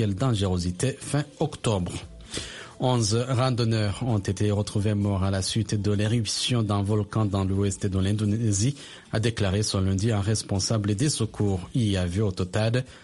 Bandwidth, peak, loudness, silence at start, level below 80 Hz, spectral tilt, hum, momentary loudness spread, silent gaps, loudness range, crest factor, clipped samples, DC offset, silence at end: 11.5 kHz; -10 dBFS; -26 LUFS; 0 s; -48 dBFS; -5.5 dB/octave; none; 5 LU; none; 1 LU; 16 dB; under 0.1%; under 0.1%; 0.05 s